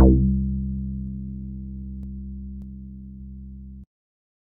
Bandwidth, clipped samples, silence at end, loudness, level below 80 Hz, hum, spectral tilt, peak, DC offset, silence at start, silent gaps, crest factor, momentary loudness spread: 1.2 kHz; under 0.1%; 0.75 s; -27 LUFS; -28 dBFS; none; -15.5 dB/octave; -2 dBFS; under 0.1%; 0 s; none; 22 dB; 18 LU